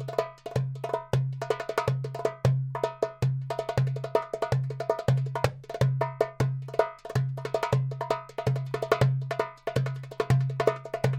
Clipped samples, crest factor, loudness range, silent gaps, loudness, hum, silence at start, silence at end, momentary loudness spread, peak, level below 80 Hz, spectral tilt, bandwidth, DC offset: under 0.1%; 22 dB; 1 LU; none; -29 LUFS; none; 0 s; 0 s; 6 LU; -6 dBFS; -54 dBFS; -7 dB/octave; 13.5 kHz; under 0.1%